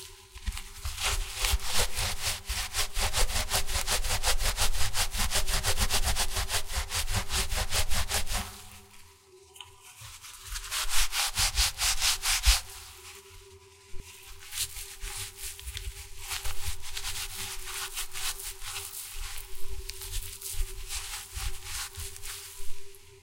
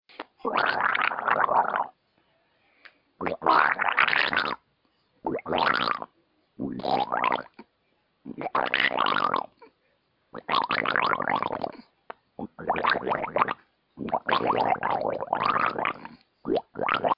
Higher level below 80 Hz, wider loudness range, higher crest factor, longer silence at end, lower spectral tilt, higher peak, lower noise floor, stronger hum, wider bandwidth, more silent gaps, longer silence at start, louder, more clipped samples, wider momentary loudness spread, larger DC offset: first, -36 dBFS vs -66 dBFS; first, 10 LU vs 4 LU; about the same, 22 dB vs 24 dB; about the same, 0.05 s vs 0.05 s; second, -1 dB/octave vs -6.5 dB/octave; second, -8 dBFS vs -2 dBFS; second, -56 dBFS vs -71 dBFS; neither; first, 17 kHz vs 5.8 kHz; neither; second, 0 s vs 0.2 s; second, -30 LUFS vs -26 LUFS; neither; about the same, 20 LU vs 18 LU; neither